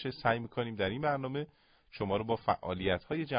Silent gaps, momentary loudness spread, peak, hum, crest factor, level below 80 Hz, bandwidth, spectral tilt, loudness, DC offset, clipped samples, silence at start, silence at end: none; 8 LU; -14 dBFS; none; 20 dB; -56 dBFS; 5 kHz; -4.5 dB/octave; -34 LUFS; under 0.1%; under 0.1%; 0 s; 0 s